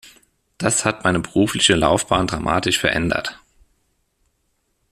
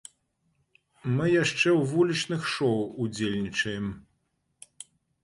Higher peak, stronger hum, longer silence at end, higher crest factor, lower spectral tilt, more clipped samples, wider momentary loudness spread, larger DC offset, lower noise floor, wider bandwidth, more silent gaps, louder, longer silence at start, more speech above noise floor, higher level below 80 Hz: first, 0 dBFS vs -12 dBFS; neither; first, 1.55 s vs 1.2 s; about the same, 20 dB vs 18 dB; second, -3.5 dB/octave vs -5 dB/octave; neither; second, 7 LU vs 23 LU; neither; second, -69 dBFS vs -75 dBFS; first, 14.5 kHz vs 11.5 kHz; neither; first, -18 LUFS vs -27 LUFS; second, 0.05 s vs 1.05 s; about the same, 50 dB vs 49 dB; first, -44 dBFS vs -60 dBFS